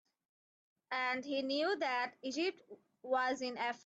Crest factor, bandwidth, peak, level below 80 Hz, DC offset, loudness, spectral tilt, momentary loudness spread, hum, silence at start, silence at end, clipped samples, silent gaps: 16 dB; 8.2 kHz; -22 dBFS; -88 dBFS; under 0.1%; -37 LUFS; -2.5 dB/octave; 5 LU; none; 0.9 s; 0.1 s; under 0.1%; none